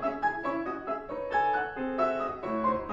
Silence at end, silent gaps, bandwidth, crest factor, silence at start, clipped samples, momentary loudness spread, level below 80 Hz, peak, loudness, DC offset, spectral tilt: 0 s; none; 7.4 kHz; 16 dB; 0 s; under 0.1%; 7 LU; -56 dBFS; -14 dBFS; -31 LUFS; under 0.1%; -7 dB/octave